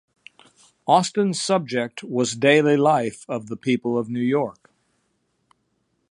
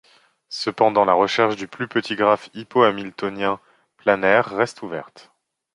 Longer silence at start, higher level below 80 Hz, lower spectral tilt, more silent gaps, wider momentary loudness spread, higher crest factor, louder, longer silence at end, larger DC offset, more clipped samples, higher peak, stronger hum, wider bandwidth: first, 0.85 s vs 0.5 s; second, -70 dBFS vs -62 dBFS; about the same, -5 dB/octave vs -5 dB/octave; neither; about the same, 11 LU vs 13 LU; about the same, 20 dB vs 20 dB; about the same, -21 LUFS vs -20 LUFS; first, 1.6 s vs 0.55 s; neither; neither; about the same, -2 dBFS vs -2 dBFS; neither; about the same, 11.5 kHz vs 11 kHz